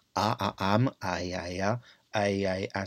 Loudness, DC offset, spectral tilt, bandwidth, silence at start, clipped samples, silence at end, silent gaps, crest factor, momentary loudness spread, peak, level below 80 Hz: -30 LUFS; under 0.1%; -5.5 dB/octave; 14 kHz; 0.15 s; under 0.1%; 0 s; none; 22 dB; 7 LU; -8 dBFS; -62 dBFS